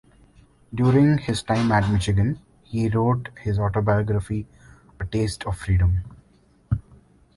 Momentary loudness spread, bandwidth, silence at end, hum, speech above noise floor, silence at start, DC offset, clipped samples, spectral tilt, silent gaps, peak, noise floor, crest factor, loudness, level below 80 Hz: 12 LU; 11.5 kHz; 0.55 s; none; 36 dB; 0.7 s; under 0.1%; under 0.1%; -7 dB/octave; none; -6 dBFS; -58 dBFS; 16 dB; -23 LUFS; -36 dBFS